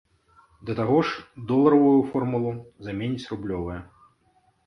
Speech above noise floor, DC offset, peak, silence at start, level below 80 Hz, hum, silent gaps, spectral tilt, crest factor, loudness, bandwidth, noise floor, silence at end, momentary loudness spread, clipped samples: 41 dB; under 0.1%; -4 dBFS; 0.65 s; -52 dBFS; none; none; -8.5 dB/octave; 20 dB; -24 LUFS; 6.4 kHz; -64 dBFS; 0.8 s; 17 LU; under 0.1%